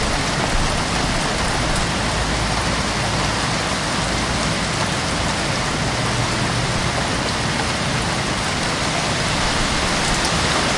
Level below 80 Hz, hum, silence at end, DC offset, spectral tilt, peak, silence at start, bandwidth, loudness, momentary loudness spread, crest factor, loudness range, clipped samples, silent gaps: -30 dBFS; none; 0 s; under 0.1%; -3.5 dB/octave; -6 dBFS; 0 s; 11.5 kHz; -19 LUFS; 2 LU; 14 dB; 1 LU; under 0.1%; none